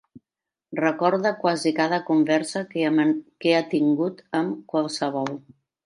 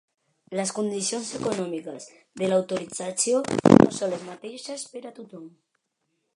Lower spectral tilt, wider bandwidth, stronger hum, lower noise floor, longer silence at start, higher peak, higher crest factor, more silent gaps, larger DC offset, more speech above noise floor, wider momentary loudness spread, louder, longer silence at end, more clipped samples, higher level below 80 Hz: about the same, -5.5 dB/octave vs -5 dB/octave; about the same, 11 kHz vs 11.5 kHz; neither; first, -88 dBFS vs -77 dBFS; second, 0.15 s vs 0.5 s; second, -6 dBFS vs 0 dBFS; second, 18 dB vs 26 dB; neither; neither; first, 66 dB vs 52 dB; second, 6 LU vs 24 LU; about the same, -23 LUFS vs -24 LUFS; second, 0.45 s vs 0.9 s; neither; second, -76 dBFS vs -56 dBFS